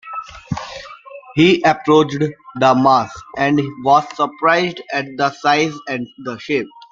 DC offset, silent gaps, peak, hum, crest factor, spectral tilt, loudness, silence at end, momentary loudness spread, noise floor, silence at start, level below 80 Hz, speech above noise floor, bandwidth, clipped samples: under 0.1%; none; 0 dBFS; none; 16 dB; -5.5 dB/octave; -16 LUFS; 0.25 s; 15 LU; -37 dBFS; 0.05 s; -54 dBFS; 21 dB; 7.6 kHz; under 0.1%